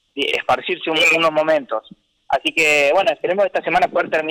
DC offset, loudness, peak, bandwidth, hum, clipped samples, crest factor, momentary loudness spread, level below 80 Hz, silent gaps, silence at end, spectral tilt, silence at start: under 0.1%; -17 LUFS; -8 dBFS; 18.5 kHz; none; under 0.1%; 10 dB; 7 LU; -56 dBFS; none; 0 s; -2.5 dB/octave; 0.15 s